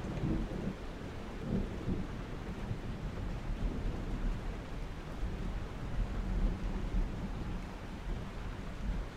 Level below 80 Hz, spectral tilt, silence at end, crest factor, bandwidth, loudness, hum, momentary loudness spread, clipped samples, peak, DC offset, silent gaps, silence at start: -40 dBFS; -7 dB/octave; 0 s; 16 dB; 10 kHz; -41 LUFS; none; 7 LU; under 0.1%; -20 dBFS; under 0.1%; none; 0 s